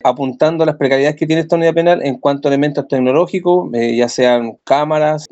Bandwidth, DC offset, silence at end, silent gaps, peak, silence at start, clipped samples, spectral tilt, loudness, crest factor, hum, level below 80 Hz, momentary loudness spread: 8.2 kHz; under 0.1%; 0.05 s; none; 0 dBFS; 0.05 s; under 0.1%; -6 dB/octave; -14 LUFS; 14 dB; none; -62 dBFS; 4 LU